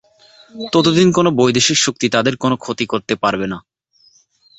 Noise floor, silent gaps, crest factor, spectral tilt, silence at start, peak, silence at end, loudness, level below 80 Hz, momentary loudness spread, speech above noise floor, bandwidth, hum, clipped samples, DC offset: -54 dBFS; none; 16 dB; -4 dB/octave; 0.55 s; 0 dBFS; 1 s; -15 LUFS; -52 dBFS; 10 LU; 39 dB; 8.2 kHz; none; under 0.1%; under 0.1%